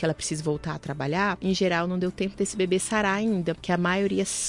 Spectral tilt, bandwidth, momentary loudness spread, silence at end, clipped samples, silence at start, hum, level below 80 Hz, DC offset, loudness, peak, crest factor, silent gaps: -4.5 dB/octave; 11.5 kHz; 5 LU; 0 s; under 0.1%; 0 s; none; -52 dBFS; under 0.1%; -26 LUFS; -10 dBFS; 14 dB; none